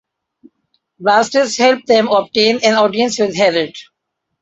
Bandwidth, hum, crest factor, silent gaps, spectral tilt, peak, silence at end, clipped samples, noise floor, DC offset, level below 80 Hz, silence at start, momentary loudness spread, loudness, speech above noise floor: 8.2 kHz; none; 14 dB; none; -3 dB/octave; 0 dBFS; 0.6 s; under 0.1%; -75 dBFS; under 0.1%; -60 dBFS; 1 s; 4 LU; -13 LUFS; 61 dB